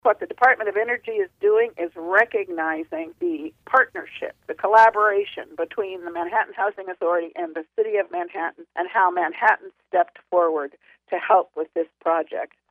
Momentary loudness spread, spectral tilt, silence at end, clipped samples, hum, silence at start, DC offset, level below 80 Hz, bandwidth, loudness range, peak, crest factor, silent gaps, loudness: 12 LU; -5 dB/octave; 0.25 s; under 0.1%; none; 0.05 s; under 0.1%; -72 dBFS; 7.6 kHz; 4 LU; -4 dBFS; 18 dB; none; -22 LUFS